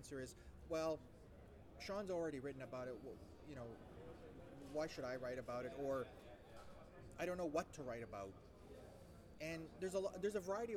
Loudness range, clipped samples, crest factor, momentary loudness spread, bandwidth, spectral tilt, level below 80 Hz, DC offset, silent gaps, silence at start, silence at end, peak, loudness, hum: 3 LU; under 0.1%; 20 dB; 17 LU; 19 kHz; -5.5 dB/octave; -66 dBFS; under 0.1%; none; 0 s; 0 s; -30 dBFS; -48 LUFS; none